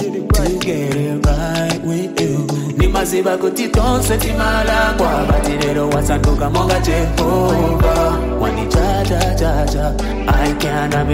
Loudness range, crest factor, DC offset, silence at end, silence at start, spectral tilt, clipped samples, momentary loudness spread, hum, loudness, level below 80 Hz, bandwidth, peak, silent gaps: 2 LU; 12 dB; under 0.1%; 0 s; 0 s; -5.5 dB/octave; under 0.1%; 4 LU; none; -16 LUFS; -20 dBFS; 16 kHz; -4 dBFS; none